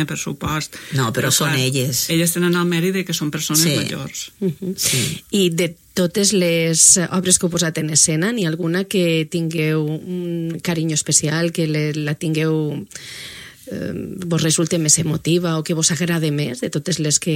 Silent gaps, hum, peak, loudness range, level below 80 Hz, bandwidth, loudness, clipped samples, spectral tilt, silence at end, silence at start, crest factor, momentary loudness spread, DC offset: none; none; 0 dBFS; 5 LU; -52 dBFS; 16.5 kHz; -18 LUFS; under 0.1%; -3.5 dB/octave; 0 s; 0 s; 18 dB; 11 LU; under 0.1%